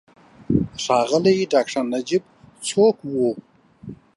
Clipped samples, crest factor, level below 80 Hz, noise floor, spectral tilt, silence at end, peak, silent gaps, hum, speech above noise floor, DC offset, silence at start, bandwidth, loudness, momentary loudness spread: under 0.1%; 18 dB; -48 dBFS; -40 dBFS; -5 dB/octave; 0.2 s; -4 dBFS; none; none; 21 dB; under 0.1%; 0.5 s; 11.5 kHz; -21 LUFS; 12 LU